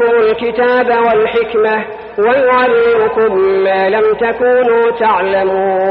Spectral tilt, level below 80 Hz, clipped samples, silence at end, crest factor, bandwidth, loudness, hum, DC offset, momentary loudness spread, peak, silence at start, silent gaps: -8 dB/octave; -48 dBFS; under 0.1%; 0 s; 10 dB; 5 kHz; -12 LUFS; none; under 0.1%; 3 LU; -2 dBFS; 0 s; none